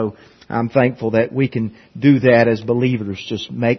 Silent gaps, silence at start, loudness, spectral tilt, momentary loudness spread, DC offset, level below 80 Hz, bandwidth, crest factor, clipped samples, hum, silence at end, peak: none; 0 s; -17 LUFS; -8 dB/octave; 13 LU; under 0.1%; -56 dBFS; 6.4 kHz; 16 dB; under 0.1%; none; 0 s; 0 dBFS